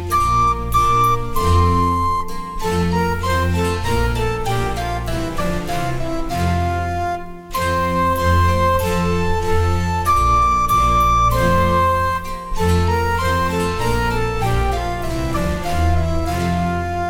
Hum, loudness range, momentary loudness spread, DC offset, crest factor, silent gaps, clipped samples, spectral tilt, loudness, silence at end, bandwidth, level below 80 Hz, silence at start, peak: none; 5 LU; 8 LU; under 0.1%; 14 dB; none; under 0.1%; -6 dB/octave; -18 LUFS; 0 s; 17.5 kHz; -26 dBFS; 0 s; -4 dBFS